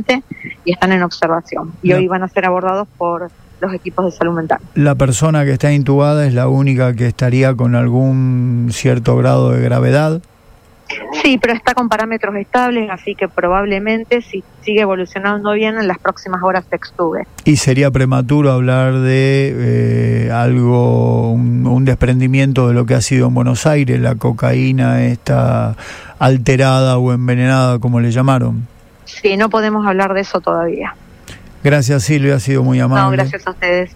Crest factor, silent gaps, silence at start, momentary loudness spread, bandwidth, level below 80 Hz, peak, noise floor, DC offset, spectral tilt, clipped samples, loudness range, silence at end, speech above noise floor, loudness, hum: 14 dB; none; 0 s; 7 LU; 11 kHz; -38 dBFS; 0 dBFS; -44 dBFS; under 0.1%; -6.5 dB/octave; under 0.1%; 4 LU; 0.05 s; 31 dB; -14 LUFS; none